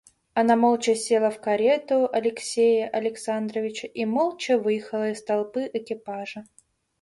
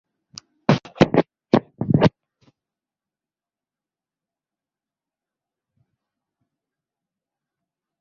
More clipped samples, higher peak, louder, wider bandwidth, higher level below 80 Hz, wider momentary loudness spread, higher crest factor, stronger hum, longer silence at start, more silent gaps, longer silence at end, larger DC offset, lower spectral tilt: neither; second, -8 dBFS vs 0 dBFS; second, -24 LUFS vs -20 LUFS; first, 11.5 kHz vs 7.4 kHz; second, -70 dBFS vs -54 dBFS; first, 11 LU vs 4 LU; second, 18 dB vs 26 dB; neither; second, 0.35 s vs 0.7 s; neither; second, 0.6 s vs 5.95 s; neither; second, -4 dB/octave vs -7.5 dB/octave